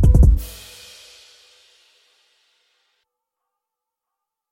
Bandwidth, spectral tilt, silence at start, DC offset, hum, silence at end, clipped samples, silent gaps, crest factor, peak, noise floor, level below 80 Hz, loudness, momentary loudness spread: 16 kHz; -7.5 dB/octave; 0 s; under 0.1%; none; 4.05 s; under 0.1%; none; 20 dB; -2 dBFS; -84 dBFS; -22 dBFS; -16 LUFS; 28 LU